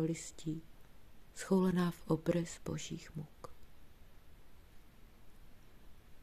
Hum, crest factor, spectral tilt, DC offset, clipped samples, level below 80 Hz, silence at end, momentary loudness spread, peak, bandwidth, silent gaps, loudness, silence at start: none; 20 dB; -6.5 dB/octave; under 0.1%; under 0.1%; -60 dBFS; 0 s; 20 LU; -20 dBFS; 14.5 kHz; none; -38 LUFS; 0 s